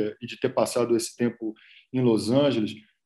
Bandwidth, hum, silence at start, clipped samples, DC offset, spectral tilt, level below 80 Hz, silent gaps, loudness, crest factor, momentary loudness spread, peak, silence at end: 13 kHz; none; 0 s; under 0.1%; under 0.1%; -5.5 dB/octave; -66 dBFS; none; -25 LUFS; 16 dB; 11 LU; -8 dBFS; 0.25 s